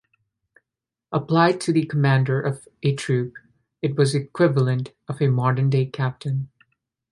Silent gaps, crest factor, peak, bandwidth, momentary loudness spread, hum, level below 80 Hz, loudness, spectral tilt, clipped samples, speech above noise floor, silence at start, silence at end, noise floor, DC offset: none; 20 dB; -2 dBFS; 11.5 kHz; 10 LU; none; -62 dBFS; -22 LUFS; -7 dB/octave; under 0.1%; 66 dB; 1.1 s; 0.65 s; -87 dBFS; under 0.1%